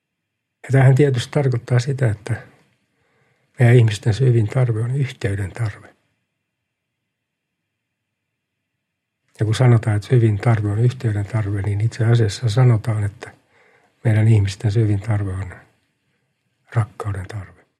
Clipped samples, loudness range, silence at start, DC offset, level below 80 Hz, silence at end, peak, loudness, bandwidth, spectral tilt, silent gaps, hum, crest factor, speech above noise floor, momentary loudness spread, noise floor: under 0.1%; 7 LU; 0.65 s; under 0.1%; -54 dBFS; 0.35 s; 0 dBFS; -19 LUFS; 10.5 kHz; -7.5 dB/octave; none; none; 18 dB; 61 dB; 13 LU; -78 dBFS